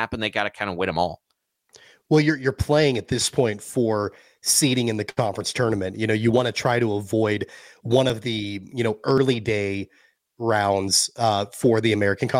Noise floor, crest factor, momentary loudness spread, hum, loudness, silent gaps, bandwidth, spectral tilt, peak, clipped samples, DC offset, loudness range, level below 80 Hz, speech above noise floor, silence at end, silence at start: -61 dBFS; 16 dB; 9 LU; none; -22 LUFS; none; 16.5 kHz; -4.5 dB/octave; -6 dBFS; under 0.1%; under 0.1%; 2 LU; -50 dBFS; 39 dB; 0 s; 0 s